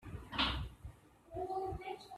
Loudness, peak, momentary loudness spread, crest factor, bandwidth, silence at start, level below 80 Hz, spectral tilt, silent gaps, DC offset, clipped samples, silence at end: -40 LUFS; -20 dBFS; 17 LU; 22 dB; 14 kHz; 0 s; -52 dBFS; -5 dB/octave; none; under 0.1%; under 0.1%; 0 s